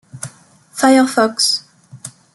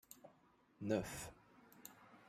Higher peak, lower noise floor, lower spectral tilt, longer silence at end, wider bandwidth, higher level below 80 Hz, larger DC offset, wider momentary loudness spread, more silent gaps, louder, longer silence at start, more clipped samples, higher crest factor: first, -2 dBFS vs -24 dBFS; second, -45 dBFS vs -72 dBFS; second, -2.5 dB/octave vs -5 dB/octave; first, 0.25 s vs 0 s; second, 12 kHz vs 16 kHz; first, -62 dBFS vs -70 dBFS; neither; about the same, 22 LU vs 24 LU; neither; first, -14 LUFS vs -45 LUFS; about the same, 0.15 s vs 0.1 s; neither; second, 16 dB vs 24 dB